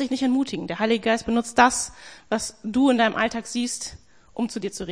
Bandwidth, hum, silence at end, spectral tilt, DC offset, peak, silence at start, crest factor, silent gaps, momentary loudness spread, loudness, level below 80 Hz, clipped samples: 10.5 kHz; none; 0 s; -3.5 dB/octave; 0.2%; -2 dBFS; 0 s; 20 dB; none; 12 LU; -23 LUFS; -54 dBFS; under 0.1%